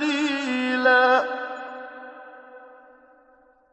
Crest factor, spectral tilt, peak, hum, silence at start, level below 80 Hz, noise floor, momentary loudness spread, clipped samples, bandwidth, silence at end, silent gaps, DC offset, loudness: 20 dB; -2.5 dB/octave; -6 dBFS; none; 0 s; -76 dBFS; -58 dBFS; 24 LU; under 0.1%; 9 kHz; 1.05 s; none; under 0.1%; -21 LUFS